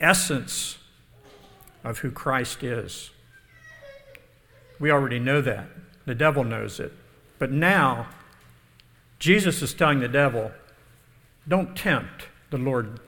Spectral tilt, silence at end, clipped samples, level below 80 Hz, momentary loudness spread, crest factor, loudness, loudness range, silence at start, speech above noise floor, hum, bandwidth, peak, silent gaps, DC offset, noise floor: -4.5 dB/octave; 0.1 s; under 0.1%; -52 dBFS; 20 LU; 24 dB; -24 LUFS; 9 LU; 0 s; 32 dB; none; 19 kHz; -2 dBFS; none; under 0.1%; -56 dBFS